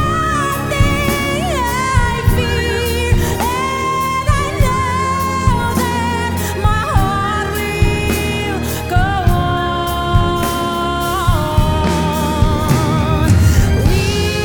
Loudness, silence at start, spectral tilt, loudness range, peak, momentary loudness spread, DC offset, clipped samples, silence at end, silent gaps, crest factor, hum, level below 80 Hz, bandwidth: -16 LUFS; 0 s; -5.5 dB/octave; 2 LU; 0 dBFS; 3 LU; under 0.1%; under 0.1%; 0 s; none; 14 dB; none; -22 dBFS; over 20 kHz